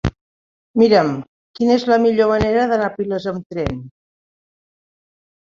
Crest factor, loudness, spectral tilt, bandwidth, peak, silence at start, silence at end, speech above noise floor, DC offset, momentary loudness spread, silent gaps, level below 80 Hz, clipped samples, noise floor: 18 dB; -17 LUFS; -7 dB/octave; 7.4 kHz; -2 dBFS; 0.05 s; 1.5 s; over 74 dB; under 0.1%; 12 LU; 0.21-0.74 s, 1.28-1.54 s, 3.46-3.50 s; -40 dBFS; under 0.1%; under -90 dBFS